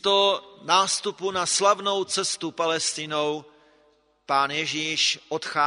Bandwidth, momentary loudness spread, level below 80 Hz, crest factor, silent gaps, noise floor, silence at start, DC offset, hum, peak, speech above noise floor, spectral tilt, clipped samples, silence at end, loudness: 11 kHz; 7 LU; -72 dBFS; 20 dB; none; -63 dBFS; 0.05 s; under 0.1%; none; -4 dBFS; 38 dB; -1.5 dB/octave; under 0.1%; 0 s; -24 LUFS